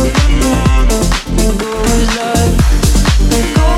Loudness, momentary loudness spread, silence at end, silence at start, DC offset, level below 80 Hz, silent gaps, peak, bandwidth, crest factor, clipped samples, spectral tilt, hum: -12 LUFS; 3 LU; 0 s; 0 s; under 0.1%; -12 dBFS; none; 0 dBFS; 15.5 kHz; 10 dB; under 0.1%; -5 dB/octave; none